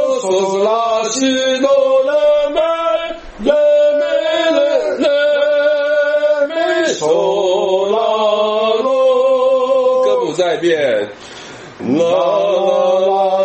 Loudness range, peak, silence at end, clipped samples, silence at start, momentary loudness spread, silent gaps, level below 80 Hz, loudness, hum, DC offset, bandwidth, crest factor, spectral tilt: 2 LU; 0 dBFS; 0 s; under 0.1%; 0 s; 4 LU; none; -50 dBFS; -14 LUFS; none; under 0.1%; 8.6 kHz; 14 dB; -3.5 dB/octave